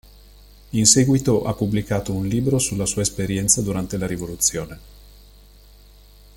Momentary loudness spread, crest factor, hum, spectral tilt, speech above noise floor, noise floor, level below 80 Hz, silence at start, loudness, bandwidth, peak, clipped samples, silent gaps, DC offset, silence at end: 11 LU; 22 dB; 50 Hz at -40 dBFS; -4 dB/octave; 27 dB; -47 dBFS; -42 dBFS; 0.75 s; -20 LUFS; 17 kHz; 0 dBFS; under 0.1%; none; under 0.1%; 1.45 s